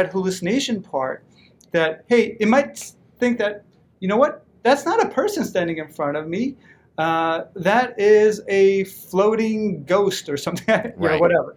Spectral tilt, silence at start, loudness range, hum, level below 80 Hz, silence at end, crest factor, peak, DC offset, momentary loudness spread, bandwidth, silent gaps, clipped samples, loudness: -5 dB/octave; 0 s; 3 LU; none; -62 dBFS; 0.05 s; 18 dB; -2 dBFS; under 0.1%; 9 LU; 17.5 kHz; none; under 0.1%; -20 LUFS